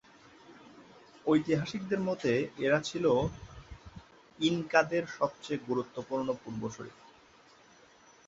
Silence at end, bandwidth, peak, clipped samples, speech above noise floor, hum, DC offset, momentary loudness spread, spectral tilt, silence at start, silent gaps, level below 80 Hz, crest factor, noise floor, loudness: 1.35 s; 8 kHz; -8 dBFS; under 0.1%; 29 dB; none; under 0.1%; 21 LU; -5.5 dB/octave; 0.5 s; none; -60 dBFS; 24 dB; -60 dBFS; -31 LUFS